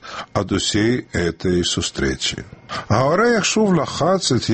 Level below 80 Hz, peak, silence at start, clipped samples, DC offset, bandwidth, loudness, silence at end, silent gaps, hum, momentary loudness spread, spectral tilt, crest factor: -40 dBFS; -2 dBFS; 0.05 s; under 0.1%; under 0.1%; 8.8 kHz; -19 LUFS; 0 s; none; none; 9 LU; -4.5 dB/octave; 18 dB